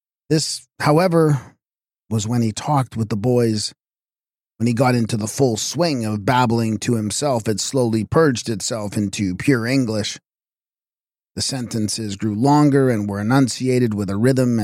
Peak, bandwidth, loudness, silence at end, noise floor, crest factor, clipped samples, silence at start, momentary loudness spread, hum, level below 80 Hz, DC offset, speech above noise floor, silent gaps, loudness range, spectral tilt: -4 dBFS; 16 kHz; -19 LUFS; 0 s; under -90 dBFS; 16 dB; under 0.1%; 0.3 s; 8 LU; none; -54 dBFS; under 0.1%; over 72 dB; none; 4 LU; -5.5 dB/octave